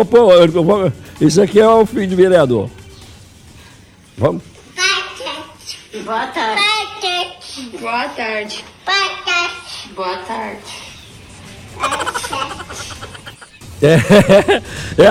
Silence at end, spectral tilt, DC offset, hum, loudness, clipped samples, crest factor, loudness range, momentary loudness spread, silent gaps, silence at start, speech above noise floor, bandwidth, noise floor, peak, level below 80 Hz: 0 s; -5 dB/octave; under 0.1%; none; -14 LUFS; under 0.1%; 14 dB; 10 LU; 20 LU; none; 0 s; 30 dB; 16 kHz; -43 dBFS; 0 dBFS; -44 dBFS